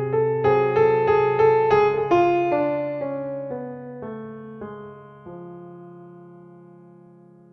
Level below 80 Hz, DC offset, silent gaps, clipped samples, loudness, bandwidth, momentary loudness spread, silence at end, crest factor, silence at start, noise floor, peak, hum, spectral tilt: -56 dBFS; under 0.1%; none; under 0.1%; -20 LUFS; 6.4 kHz; 23 LU; 1.15 s; 16 dB; 0 s; -49 dBFS; -6 dBFS; none; -8.5 dB/octave